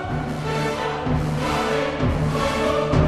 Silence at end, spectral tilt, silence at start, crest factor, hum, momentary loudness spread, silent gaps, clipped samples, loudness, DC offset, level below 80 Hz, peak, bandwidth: 0 s; -6 dB/octave; 0 s; 16 dB; none; 4 LU; none; under 0.1%; -23 LUFS; under 0.1%; -34 dBFS; -6 dBFS; 13.5 kHz